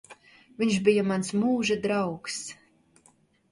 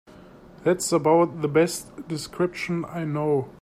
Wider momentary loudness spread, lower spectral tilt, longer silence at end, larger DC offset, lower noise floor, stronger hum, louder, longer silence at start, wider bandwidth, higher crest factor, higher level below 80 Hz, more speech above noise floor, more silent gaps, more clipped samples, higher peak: about the same, 11 LU vs 13 LU; about the same, -5 dB/octave vs -5.5 dB/octave; first, 1 s vs 0.1 s; neither; first, -63 dBFS vs -47 dBFS; neither; about the same, -26 LUFS vs -24 LUFS; about the same, 0.1 s vs 0.15 s; second, 11.5 kHz vs 15.5 kHz; about the same, 20 dB vs 18 dB; second, -66 dBFS vs -58 dBFS; first, 37 dB vs 24 dB; neither; neither; about the same, -8 dBFS vs -8 dBFS